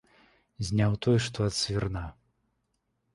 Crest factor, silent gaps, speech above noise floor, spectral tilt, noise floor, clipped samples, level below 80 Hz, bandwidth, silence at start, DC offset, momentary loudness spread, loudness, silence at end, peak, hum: 18 dB; none; 50 dB; -5.5 dB/octave; -77 dBFS; under 0.1%; -48 dBFS; 11.5 kHz; 0.6 s; under 0.1%; 12 LU; -29 LUFS; 1.05 s; -12 dBFS; none